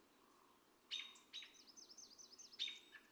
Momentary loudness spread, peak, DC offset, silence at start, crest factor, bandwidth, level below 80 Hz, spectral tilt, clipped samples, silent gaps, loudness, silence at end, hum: 12 LU; -34 dBFS; under 0.1%; 0 s; 24 dB; over 20 kHz; under -90 dBFS; 1.5 dB/octave; under 0.1%; none; -52 LUFS; 0 s; none